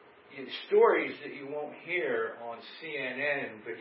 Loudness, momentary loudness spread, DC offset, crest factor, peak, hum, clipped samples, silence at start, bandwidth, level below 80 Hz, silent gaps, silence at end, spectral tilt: -31 LUFS; 18 LU; under 0.1%; 20 dB; -12 dBFS; none; under 0.1%; 0.3 s; 5.6 kHz; -88 dBFS; none; 0 s; -1.5 dB/octave